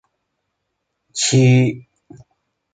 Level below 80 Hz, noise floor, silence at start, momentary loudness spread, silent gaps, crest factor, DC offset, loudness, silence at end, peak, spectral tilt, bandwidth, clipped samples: -58 dBFS; -75 dBFS; 1.15 s; 18 LU; none; 16 dB; under 0.1%; -15 LUFS; 0.95 s; -4 dBFS; -5 dB/octave; 9.4 kHz; under 0.1%